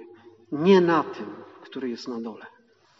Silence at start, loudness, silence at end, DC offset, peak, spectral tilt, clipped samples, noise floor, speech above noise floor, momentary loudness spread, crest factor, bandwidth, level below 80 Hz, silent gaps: 0 s; -24 LUFS; 0.5 s; under 0.1%; -6 dBFS; -5.5 dB/octave; under 0.1%; -49 dBFS; 26 dB; 21 LU; 20 dB; 7.2 kHz; -76 dBFS; none